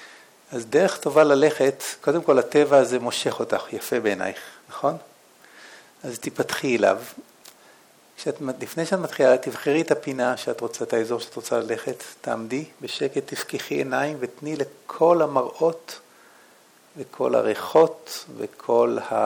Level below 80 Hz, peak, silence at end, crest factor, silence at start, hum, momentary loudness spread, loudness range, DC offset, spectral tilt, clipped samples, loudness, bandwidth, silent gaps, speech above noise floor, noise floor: -74 dBFS; -4 dBFS; 0 s; 20 dB; 0 s; none; 15 LU; 8 LU; under 0.1%; -4.5 dB/octave; under 0.1%; -23 LUFS; 19.5 kHz; none; 32 dB; -54 dBFS